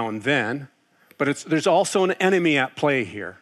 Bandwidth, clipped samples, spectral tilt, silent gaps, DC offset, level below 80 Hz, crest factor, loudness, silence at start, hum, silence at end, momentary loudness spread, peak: 13 kHz; under 0.1%; -4.5 dB/octave; none; under 0.1%; -76 dBFS; 16 dB; -21 LUFS; 0 s; none; 0.05 s; 8 LU; -6 dBFS